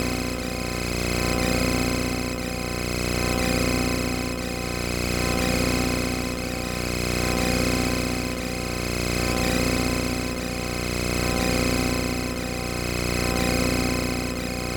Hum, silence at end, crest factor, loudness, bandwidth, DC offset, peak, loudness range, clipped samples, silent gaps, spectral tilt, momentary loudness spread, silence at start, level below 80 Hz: 60 Hz at -30 dBFS; 0 s; 16 dB; -25 LUFS; 19 kHz; under 0.1%; -10 dBFS; 1 LU; under 0.1%; none; -4.5 dB/octave; 5 LU; 0 s; -34 dBFS